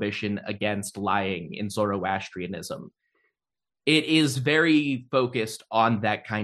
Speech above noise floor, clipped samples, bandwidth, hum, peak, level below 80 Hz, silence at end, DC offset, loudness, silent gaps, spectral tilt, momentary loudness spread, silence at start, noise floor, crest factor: over 65 dB; under 0.1%; 12.5 kHz; none; -6 dBFS; -66 dBFS; 0 s; under 0.1%; -25 LUFS; none; -5 dB/octave; 13 LU; 0 s; under -90 dBFS; 20 dB